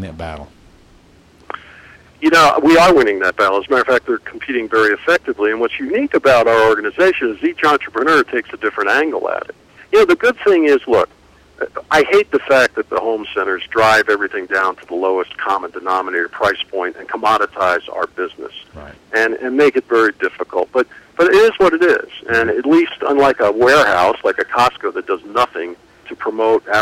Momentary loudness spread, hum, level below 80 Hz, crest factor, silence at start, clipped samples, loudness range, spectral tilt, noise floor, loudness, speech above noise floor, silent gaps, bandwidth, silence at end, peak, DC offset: 13 LU; none; -48 dBFS; 14 dB; 0 s; under 0.1%; 5 LU; -4.5 dB/octave; -47 dBFS; -15 LUFS; 33 dB; none; 16 kHz; 0 s; -2 dBFS; under 0.1%